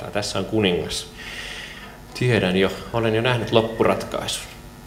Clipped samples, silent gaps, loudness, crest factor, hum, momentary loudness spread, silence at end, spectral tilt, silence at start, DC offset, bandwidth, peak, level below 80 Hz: under 0.1%; none; -22 LUFS; 22 dB; none; 14 LU; 0 s; -5 dB/octave; 0 s; under 0.1%; 16.5 kHz; -2 dBFS; -44 dBFS